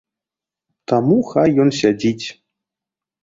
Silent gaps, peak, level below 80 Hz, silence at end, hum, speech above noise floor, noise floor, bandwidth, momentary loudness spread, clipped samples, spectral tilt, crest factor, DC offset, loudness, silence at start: none; -2 dBFS; -56 dBFS; 0.9 s; none; 72 dB; -88 dBFS; 7.8 kHz; 14 LU; under 0.1%; -6.5 dB/octave; 16 dB; under 0.1%; -16 LUFS; 0.9 s